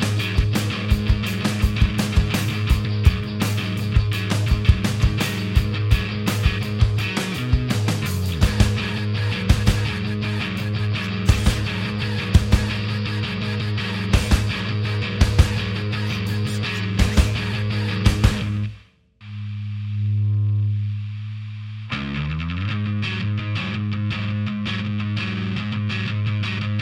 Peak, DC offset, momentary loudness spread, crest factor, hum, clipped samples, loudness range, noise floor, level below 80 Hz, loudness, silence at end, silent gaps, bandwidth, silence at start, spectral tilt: -2 dBFS; under 0.1%; 6 LU; 20 dB; none; under 0.1%; 4 LU; -48 dBFS; -28 dBFS; -22 LUFS; 0 s; none; 17 kHz; 0 s; -5.5 dB/octave